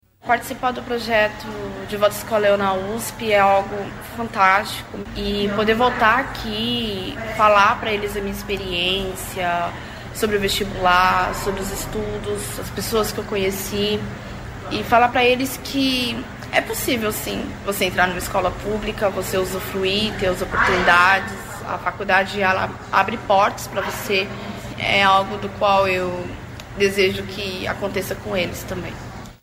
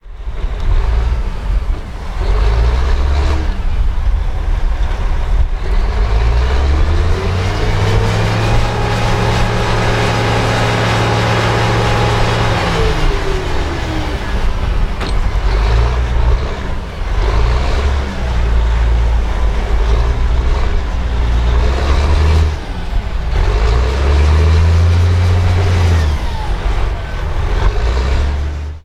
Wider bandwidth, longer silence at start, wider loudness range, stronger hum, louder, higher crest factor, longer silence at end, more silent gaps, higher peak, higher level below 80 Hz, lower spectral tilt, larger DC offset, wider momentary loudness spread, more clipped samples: first, 16 kHz vs 11 kHz; first, 0.25 s vs 0.05 s; about the same, 3 LU vs 4 LU; neither; second, -20 LUFS vs -16 LUFS; first, 18 dB vs 12 dB; about the same, 0.05 s vs 0.05 s; neither; about the same, -2 dBFS vs -2 dBFS; second, -40 dBFS vs -14 dBFS; second, -4 dB/octave vs -6 dB/octave; neither; first, 13 LU vs 7 LU; neither